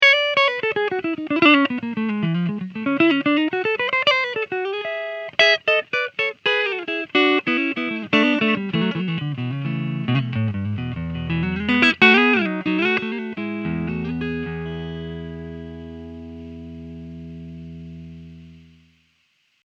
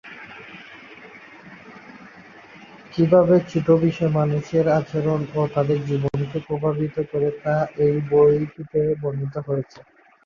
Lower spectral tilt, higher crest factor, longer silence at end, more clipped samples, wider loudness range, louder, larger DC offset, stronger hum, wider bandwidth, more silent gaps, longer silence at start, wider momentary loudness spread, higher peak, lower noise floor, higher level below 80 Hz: second, -6 dB/octave vs -9 dB/octave; about the same, 22 dB vs 18 dB; first, 1.1 s vs 0.45 s; neither; first, 17 LU vs 4 LU; about the same, -20 LUFS vs -21 LUFS; neither; neither; first, 8.2 kHz vs 7.2 kHz; neither; about the same, 0 s vs 0.05 s; second, 22 LU vs 25 LU; first, 0 dBFS vs -4 dBFS; first, -65 dBFS vs -45 dBFS; about the same, -50 dBFS vs -54 dBFS